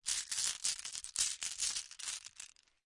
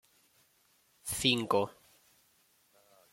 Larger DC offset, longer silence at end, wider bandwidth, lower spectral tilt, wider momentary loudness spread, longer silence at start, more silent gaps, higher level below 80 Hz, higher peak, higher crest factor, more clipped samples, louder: neither; second, 0.4 s vs 1.4 s; second, 11.5 kHz vs 16.5 kHz; second, 3.5 dB/octave vs -3 dB/octave; about the same, 14 LU vs 12 LU; second, 0.05 s vs 1.05 s; neither; second, -72 dBFS vs -66 dBFS; about the same, -14 dBFS vs -12 dBFS; about the same, 26 dB vs 26 dB; neither; second, -37 LUFS vs -31 LUFS